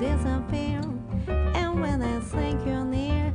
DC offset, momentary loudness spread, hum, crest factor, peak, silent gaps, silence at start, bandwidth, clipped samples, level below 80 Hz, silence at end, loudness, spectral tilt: under 0.1%; 4 LU; none; 12 dB; -14 dBFS; none; 0 s; 10 kHz; under 0.1%; -32 dBFS; 0 s; -28 LUFS; -7.5 dB/octave